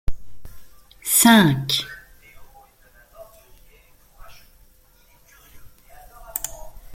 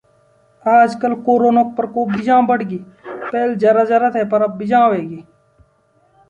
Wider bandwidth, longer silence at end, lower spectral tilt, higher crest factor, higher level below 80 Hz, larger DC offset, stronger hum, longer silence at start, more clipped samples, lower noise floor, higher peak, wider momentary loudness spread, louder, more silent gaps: first, 16.5 kHz vs 9 kHz; second, 0 s vs 1.05 s; second, -3 dB/octave vs -7.5 dB/octave; first, 24 dB vs 14 dB; first, -40 dBFS vs -60 dBFS; neither; neither; second, 0.1 s vs 0.65 s; neither; about the same, -54 dBFS vs -57 dBFS; about the same, -2 dBFS vs -2 dBFS; first, 26 LU vs 14 LU; second, -18 LUFS vs -15 LUFS; neither